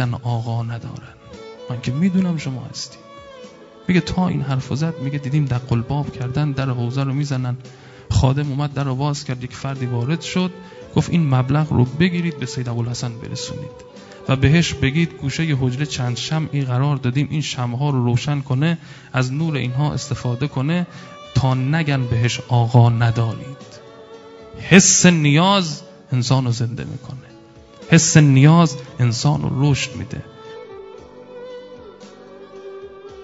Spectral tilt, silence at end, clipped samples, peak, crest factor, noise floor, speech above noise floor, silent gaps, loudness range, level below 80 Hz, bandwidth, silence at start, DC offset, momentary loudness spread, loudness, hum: -5 dB/octave; 0 s; under 0.1%; 0 dBFS; 20 dB; -44 dBFS; 25 dB; none; 7 LU; -44 dBFS; 8 kHz; 0 s; under 0.1%; 23 LU; -19 LUFS; none